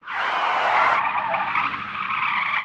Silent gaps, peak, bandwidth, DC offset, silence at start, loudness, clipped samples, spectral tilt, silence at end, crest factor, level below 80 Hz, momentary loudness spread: none; -4 dBFS; 9.4 kHz; under 0.1%; 0.05 s; -21 LUFS; under 0.1%; -3 dB/octave; 0 s; 18 dB; -62 dBFS; 7 LU